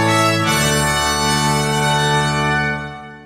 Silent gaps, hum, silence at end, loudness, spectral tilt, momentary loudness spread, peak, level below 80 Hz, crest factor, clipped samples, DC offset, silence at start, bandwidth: none; none; 0 s; -16 LUFS; -3.5 dB/octave; 5 LU; -2 dBFS; -36 dBFS; 14 dB; under 0.1%; under 0.1%; 0 s; 16 kHz